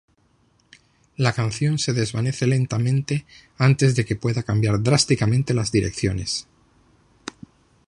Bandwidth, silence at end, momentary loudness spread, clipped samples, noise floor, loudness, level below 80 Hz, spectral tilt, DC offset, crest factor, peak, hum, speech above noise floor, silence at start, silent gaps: 11 kHz; 1.45 s; 10 LU; under 0.1%; -62 dBFS; -21 LUFS; -46 dBFS; -5.5 dB/octave; under 0.1%; 20 dB; -2 dBFS; none; 41 dB; 1.2 s; none